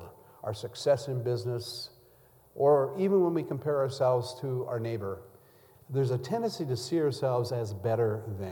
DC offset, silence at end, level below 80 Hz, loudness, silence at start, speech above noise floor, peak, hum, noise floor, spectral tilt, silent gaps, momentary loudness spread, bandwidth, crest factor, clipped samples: under 0.1%; 0 s; -70 dBFS; -30 LUFS; 0 s; 31 dB; -12 dBFS; none; -60 dBFS; -7 dB/octave; none; 13 LU; 19 kHz; 18 dB; under 0.1%